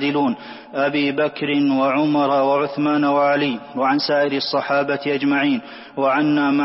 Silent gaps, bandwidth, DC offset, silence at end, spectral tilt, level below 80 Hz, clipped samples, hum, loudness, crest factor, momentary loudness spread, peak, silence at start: none; 5.8 kHz; under 0.1%; 0 s; -8.5 dB/octave; -66 dBFS; under 0.1%; none; -19 LUFS; 12 dB; 6 LU; -6 dBFS; 0 s